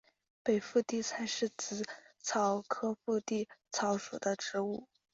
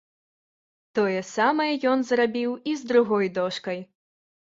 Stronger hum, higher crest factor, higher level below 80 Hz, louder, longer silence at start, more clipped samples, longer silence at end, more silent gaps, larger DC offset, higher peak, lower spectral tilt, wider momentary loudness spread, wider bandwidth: neither; about the same, 18 dB vs 18 dB; second, -78 dBFS vs -72 dBFS; second, -36 LUFS vs -24 LUFS; second, 0.45 s vs 0.95 s; neither; second, 0.3 s vs 0.75 s; neither; neither; second, -18 dBFS vs -6 dBFS; second, -3.5 dB/octave vs -5 dB/octave; about the same, 7 LU vs 9 LU; about the same, 8 kHz vs 7.8 kHz